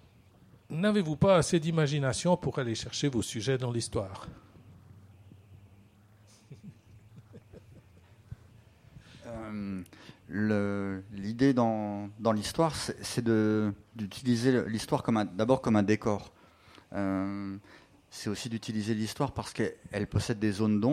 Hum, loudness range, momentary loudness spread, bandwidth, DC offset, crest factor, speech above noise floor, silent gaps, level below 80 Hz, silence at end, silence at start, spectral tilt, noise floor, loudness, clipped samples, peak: none; 12 LU; 16 LU; 14.5 kHz; under 0.1%; 22 dB; 30 dB; none; -58 dBFS; 0 s; 0.7 s; -6 dB/octave; -59 dBFS; -30 LUFS; under 0.1%; -10 dBFS